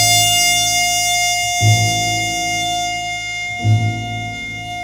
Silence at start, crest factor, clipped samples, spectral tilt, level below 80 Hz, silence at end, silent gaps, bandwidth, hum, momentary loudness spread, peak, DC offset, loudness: 0 s; 16 dB; under 0.1%; -2 dB/octave; -42 dBFS; 0 s; none; 18 kHz; none; 12 LU; 0 dBFS; under 0.1%; -15 LUFS